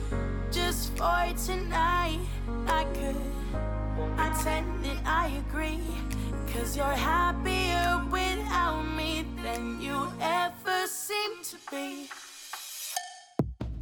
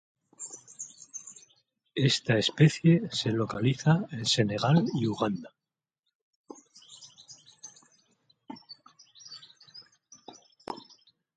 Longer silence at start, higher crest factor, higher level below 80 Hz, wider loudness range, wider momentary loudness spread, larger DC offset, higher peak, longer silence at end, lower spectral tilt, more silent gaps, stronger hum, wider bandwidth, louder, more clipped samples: second, 0 s vs 0.4 s; about the same, 16 dB vs 20 dB; first, -36 dBFS vs -66 dBFS; second, 4 LU vs 23 LU; second, 10 LU vs 25 LU; neither; second, -14 dBFS vs -10 dBFS; second, 0 s vs 0.6 s; second, -4 dB/octave vs -5.5 dB/octave; second, none vs 5.99-6.03 s, 6.15-6.44 s; neither; first, 19 kHz vs 9.4 kHz; second, -30 LUFS vs -26 LUFS; neither